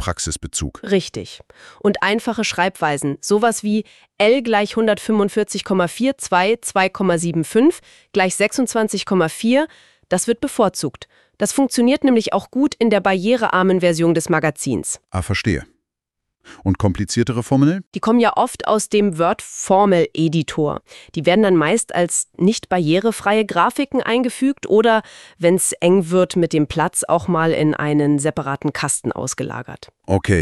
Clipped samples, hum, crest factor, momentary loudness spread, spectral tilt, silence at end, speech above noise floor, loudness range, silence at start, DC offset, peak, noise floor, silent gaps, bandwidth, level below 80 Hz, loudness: under 0.1%; none; 16 dB; 8 LU; -5 dB/octave; 0 s; 63 dB; 3 LU; 0 s; under 0.1%; 0 dBFS; -80 dBFS; 17.87-17.91 s; 12.5 kHz; -46 dBFS; -18 LUFS